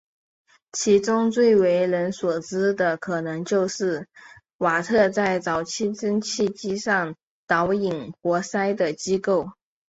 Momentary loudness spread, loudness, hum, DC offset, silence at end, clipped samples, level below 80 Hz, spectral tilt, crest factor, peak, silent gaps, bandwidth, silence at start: 8 LU; -23 LUFS; none; under 0.1%; 0.4 s; under 0.1%; -62 dBFS; -4.5 dB/octave; 16 dB; -6 dBFS; 4.54-4.59 s, 7.23-7.47 s; 8 kHz; 0.75 s